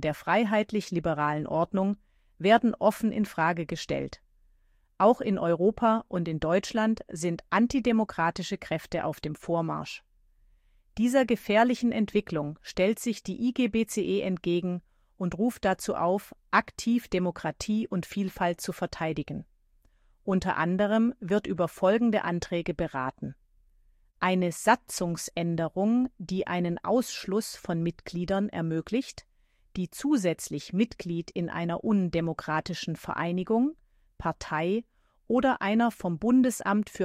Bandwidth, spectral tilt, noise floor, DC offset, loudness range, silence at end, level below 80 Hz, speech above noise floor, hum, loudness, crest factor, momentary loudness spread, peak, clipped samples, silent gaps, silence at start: 15.5 kHz; -6 dB/octave; -65 dBFS; under 0.1%; 4 LU; 0 s; -56 dBFS; 37 dB; none; -28 LUFS; 20 dB; 9 LU; -8 dBFS; under 0.1%; none; 0 s